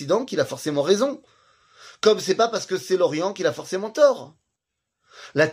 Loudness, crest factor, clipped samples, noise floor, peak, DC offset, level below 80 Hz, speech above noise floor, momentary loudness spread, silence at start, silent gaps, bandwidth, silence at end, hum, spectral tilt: -22 LUFS; 18 dB; under 0.1%; -81 dBFS; -4 dBFS; under 0.1%; -72 dBFS; 60 dB; 9 LU; 0 s; none; 15.5 kHz; 0 s; none; -4 dB/octave